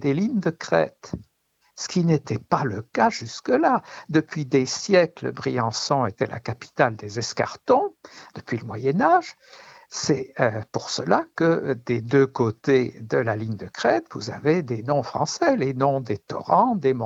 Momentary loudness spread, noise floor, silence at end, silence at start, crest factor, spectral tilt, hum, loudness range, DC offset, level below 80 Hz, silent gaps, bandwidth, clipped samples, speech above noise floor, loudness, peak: 11 LU; -60 dBFS; 0 s; 0 s; 20 dB; -5.5 dB/octave; none; 2 LU; under 0.1%; -60 dBFS; none; 8 kHz; under 0.1%; 37 dB; -23 LUFS; -4 dBFS